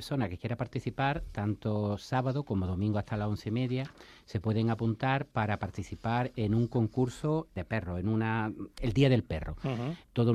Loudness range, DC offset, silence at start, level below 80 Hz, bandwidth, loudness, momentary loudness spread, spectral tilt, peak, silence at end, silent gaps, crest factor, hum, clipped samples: 2 LU; under 0.1%; 0 s; -50 dBFS; 12 kHz; -32 LUFS; 7 LU; -7.5 dB/octave; -12 dBFS; 0 s; none; 18 dB; none; under 0.1%